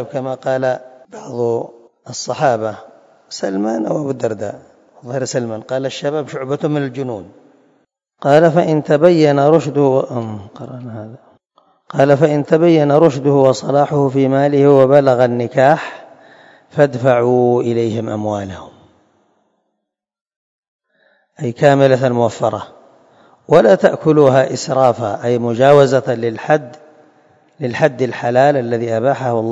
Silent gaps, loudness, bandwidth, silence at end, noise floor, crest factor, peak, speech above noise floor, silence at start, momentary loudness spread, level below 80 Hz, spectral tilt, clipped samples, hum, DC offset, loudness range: 20.21-20.25 s, 20.36-20.79 s; -14 LUFS; 8 kHz; 0 s; -76 dBFS; 16 dB; 0 dBFS; 63 dB; 0 s; 15 LU; -60 dBFS; -6.5 dB/octave; 0.2%; none; under 0.1%; 9 LU